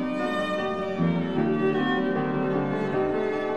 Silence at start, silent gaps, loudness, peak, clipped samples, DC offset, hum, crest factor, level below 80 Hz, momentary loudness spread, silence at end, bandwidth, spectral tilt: 0 s; none; -26 LUFS; -14 dBFS; under 0.1%; 0.5%; none; 12 dB; -58 dBFS; 3 LU; 0 s; 9 kHz; -7.5 dB/octave